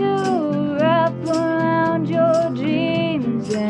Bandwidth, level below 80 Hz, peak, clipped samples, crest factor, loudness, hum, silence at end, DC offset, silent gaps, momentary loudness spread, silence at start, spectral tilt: 10.5 kHz; -58 dBFS; -6 dBFS; under 0.1%; 12 dB; -19 LUFS; none; 0 s; under 0.1%; none; 4 LU; 0 s; -7 dB/octave